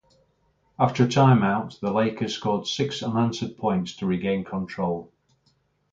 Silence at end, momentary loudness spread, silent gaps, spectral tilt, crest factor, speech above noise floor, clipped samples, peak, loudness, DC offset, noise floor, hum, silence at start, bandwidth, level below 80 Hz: 0.85 s; 10 LU; none; -6.5 dB/octave; 20 dB; 44 dB; under 0.1%; -6 dBFS; -24 LUFS; under 0.1%; -67 dBFS; none; 0.8 s; 7.8 kHz; -58 dBFS